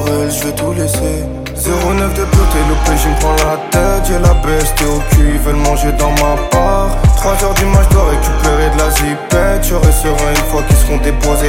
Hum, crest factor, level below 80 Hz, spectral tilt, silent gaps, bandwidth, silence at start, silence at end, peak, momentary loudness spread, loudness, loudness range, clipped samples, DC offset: none; 10 dB; -14 dBFS; -5 dB/octave; none; 17 kHz; 0 s; 0 s; 0 dBFS; 4 LU; -12 LUFS; 2 LU; under 0.1%; under 0.1%